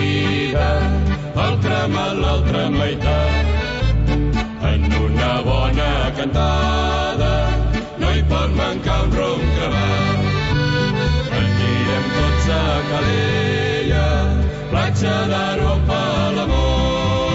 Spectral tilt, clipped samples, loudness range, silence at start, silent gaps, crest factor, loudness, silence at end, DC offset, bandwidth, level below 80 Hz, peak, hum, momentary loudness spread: -6.5 dB/octave; under 0.1%; 1 LU; 0 s; none; 10 dB; -18 LUFS; 0 s; under 0.1%; 8 kHz; -22 dBFS; -6 dBFS; none; 2 LU